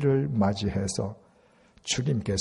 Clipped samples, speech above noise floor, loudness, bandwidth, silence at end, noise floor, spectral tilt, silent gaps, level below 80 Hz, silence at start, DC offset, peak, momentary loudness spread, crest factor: under 0.1%; 34 dB; -28 LUFS; 11.5 kHz; 0 s; -60 dBFS; -5.5 dB/octave; none; -52 dBFS; 0 s; under 0.1%; -12 dBFS; 9 LU; 16 dB